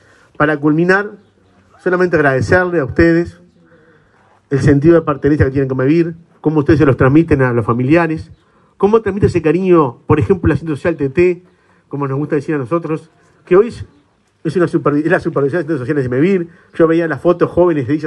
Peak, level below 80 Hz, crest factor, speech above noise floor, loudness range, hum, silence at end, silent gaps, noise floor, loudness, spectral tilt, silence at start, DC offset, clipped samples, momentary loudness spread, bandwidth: 0 dBFS; -38 dBFS; 14 dB; 38 dB; 4 LU; none; 0 s; none; -51 dBFS; -14 LUFS; -8.5 dB/octave; 0.4 s; under 0.1%; under 0.1%; 9 LU; 10 kHz